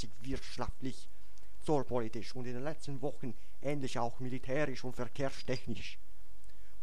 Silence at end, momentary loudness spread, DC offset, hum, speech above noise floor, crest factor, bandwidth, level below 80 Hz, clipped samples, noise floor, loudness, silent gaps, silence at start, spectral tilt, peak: 0 s; 10 LU; 3%; none; 20 dB; 20 dB; 16 kHz; -56 dBFS; under 0.1%; -59 dBFS; -40 LUFS; none; 0 s; -6 dB/octave; -18 dBFS